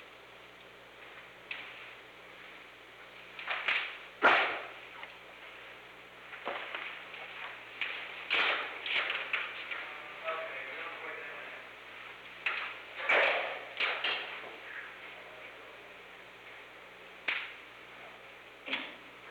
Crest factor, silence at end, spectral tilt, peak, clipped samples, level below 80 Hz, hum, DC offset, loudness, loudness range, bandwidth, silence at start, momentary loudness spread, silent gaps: 24 dB; 0 s; -2.5 dB/octave; -14 dBFS; under 0.1%; -76 dBFS; 60 Hz at -70 dBFS; under 0.1%; -34 LUFS; 10 LU; 19 kHz; 0 s; 21 LU; none